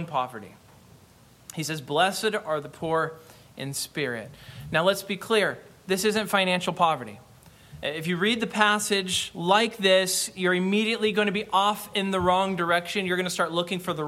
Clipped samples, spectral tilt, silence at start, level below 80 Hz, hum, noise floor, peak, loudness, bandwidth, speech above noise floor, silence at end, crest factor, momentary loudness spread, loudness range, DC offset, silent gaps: under 0.1%; -3.5 dB/octave; 0 s; -60 dBFS; none; -55 dBFS; -6 dBFS; -25 LUFS; 16.5 kHz; 29 dB; 0 s; 20 dB; 11 LU; 6 LU; under 0.1%; none